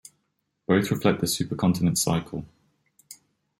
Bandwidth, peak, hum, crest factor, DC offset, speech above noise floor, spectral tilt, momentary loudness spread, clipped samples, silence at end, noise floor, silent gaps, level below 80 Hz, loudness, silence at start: 16.5 kHz; -8 dBFS; none; 20 dB; under 0.1%; 52 dB; -5 dB/octave; 15 LU; under 0.1%; 0.45 s; -76 dBFS; none; -56 dBFS; -24 LUFS; 0.7 s